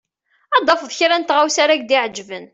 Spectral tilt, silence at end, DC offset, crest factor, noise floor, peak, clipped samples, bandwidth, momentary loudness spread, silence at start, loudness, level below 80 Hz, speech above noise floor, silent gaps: -1 dB/octave; 0.05 s; under 0.1%; 16 dB; -37 dBFS; -2 dBFS; under 0.1%; 8.4 kHz; 5 LU; 0.5 s; -16 LUFS; -66 dBFS; 20 dB; none